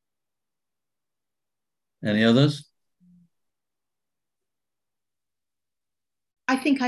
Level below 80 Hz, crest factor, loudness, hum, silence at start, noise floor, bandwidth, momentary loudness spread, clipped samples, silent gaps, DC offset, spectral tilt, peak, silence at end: -70 dBFS; 24 dB; -22 LUFS; none; 2 s; under -90 dBFS; 12 kHz; 14 LU; under 0.1%; none; under 0.1%; -6.5 dB/octave; -6 dBFS; 0 s